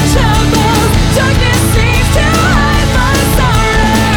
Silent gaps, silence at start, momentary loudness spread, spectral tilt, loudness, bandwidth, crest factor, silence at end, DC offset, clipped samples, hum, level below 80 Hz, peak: none; 0 s; 1 LU; -4.5 dB/octave; -10 LUFS; over 20 kHz; 8 dB; 0 s; under 0.1%; under 0.1%; none; -14 dBFS; 0 dBFS